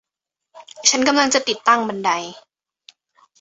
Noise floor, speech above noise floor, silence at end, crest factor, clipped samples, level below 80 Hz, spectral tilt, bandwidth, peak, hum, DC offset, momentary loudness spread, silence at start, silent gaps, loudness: -84 dBFS; 66 dB; 1.05 s; 20 dB; under 0.1%; -64 dBFS; -1 dB/octave; 8.2 kHz; 0 dBFS; none; under 0.1%; 7 LU; 0.55 s; none; -17 LUFS